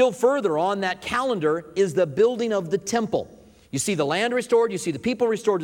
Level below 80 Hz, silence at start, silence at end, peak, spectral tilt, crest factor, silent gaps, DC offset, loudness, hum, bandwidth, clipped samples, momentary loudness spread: -60 dBFS; 0 s; 0 s; -6 dBFS; -4.5 dB/octave; 16 dB; none; under 0.1%; -23 LUFS; none; 16.5 kHz; under 0.1%; 6 LU